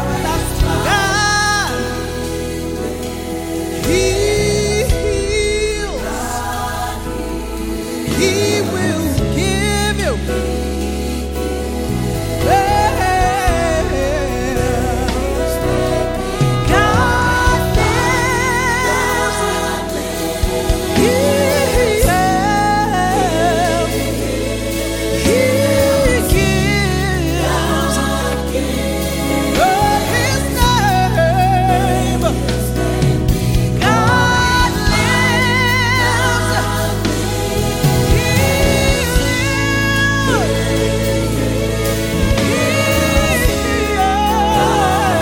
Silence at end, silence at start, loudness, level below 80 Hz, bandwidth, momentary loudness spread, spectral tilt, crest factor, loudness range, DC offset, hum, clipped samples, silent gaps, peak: 0 s; 0 s; -15 LUFS; -24 dBFS; 17 kHz; 8 LU; -4.5 dB/octave; 14 dB; 4 LU; under 0.1%; none; under 0.1%; none; 0 dBFS